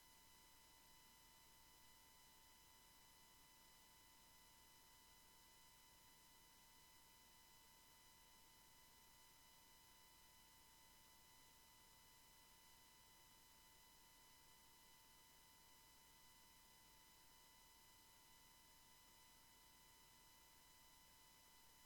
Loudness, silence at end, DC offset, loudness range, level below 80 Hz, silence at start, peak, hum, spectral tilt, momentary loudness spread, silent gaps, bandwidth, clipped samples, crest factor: -68 LUFS; 0 s; under 0.1%; 0 LU; -82 dBFS; 0 s; -54 dBFS; 60 Hz at -85 dBFS; -1 dB/octave; 0 LU; none; 19 kHz; under 0.1%; 16 dB